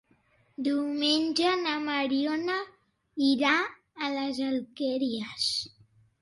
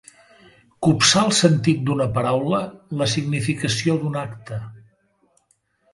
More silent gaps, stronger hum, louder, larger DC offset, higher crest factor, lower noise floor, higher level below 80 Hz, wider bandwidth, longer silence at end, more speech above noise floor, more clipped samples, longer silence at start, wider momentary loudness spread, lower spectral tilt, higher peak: neither; neither; second, -28 LUFS vs -20 LUFS; neither; about the same, 18 dB vs 20 dB; about the same, -66 dBFS vs -65 dBFS; second, -72 dBFS vs -54 dBFS; about the same, 11.5 kHz vs 11.5 kHz; second, 0.55 s vs 1.15 s; second, 38 dB vs 45 dB; neither; second, 0.6 s vs 0.8 s; second, 10 LU vs 16 LU; second, -3 dB/octave vs -4.5 dB/octave; second, -10 dBFS vs -2 dBFS